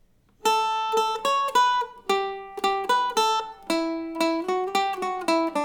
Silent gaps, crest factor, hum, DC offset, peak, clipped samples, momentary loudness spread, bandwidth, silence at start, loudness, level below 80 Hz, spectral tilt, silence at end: none; 16 dB; none; under 0.1%; -10 dBFS; under 0.1%; 6 LU; 20 kHz; 0.45 s; -24 LUFS; -62 dBFS; -2 dB/octave; 0 s